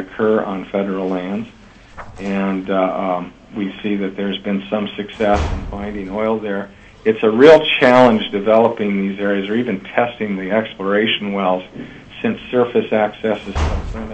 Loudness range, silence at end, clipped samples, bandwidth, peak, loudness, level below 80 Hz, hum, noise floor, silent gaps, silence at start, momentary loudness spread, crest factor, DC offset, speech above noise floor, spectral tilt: 8 LU; 0 s; under 0.1%; 8.6 kHz; 0 dBFS; -17 LUFS; -34 dBFS; none; -37 dBFS; none; 0 s; 15 LU; 18 dB; under 0.1%; 20 dB; -6.5 dB/octave